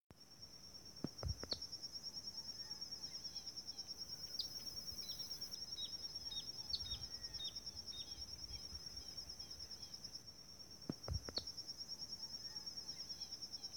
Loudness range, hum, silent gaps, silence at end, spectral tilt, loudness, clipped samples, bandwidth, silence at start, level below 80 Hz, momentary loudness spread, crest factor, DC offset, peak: 3 LU; none; 0.01-0.10 s; 0 s; -2.5 dB/octave; -47 LUFS; under 0.1%; 18 kHz; 0 s; -64 dBFS; 6 LU; 22 dB; under 0.1%; -28 dBFS